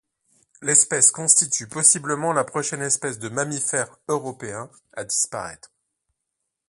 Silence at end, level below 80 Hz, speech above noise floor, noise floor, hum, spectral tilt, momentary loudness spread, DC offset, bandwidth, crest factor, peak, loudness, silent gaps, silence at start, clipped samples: 1.15 s; -66 dBFS; 58 dB; -80 dBFS; none; -2 dB/octave; 17 LU; under 0.1%; 12 kHz; 24 dB; 0 dBFS; -20 LUFS; none; 0.6 s; under 0.1%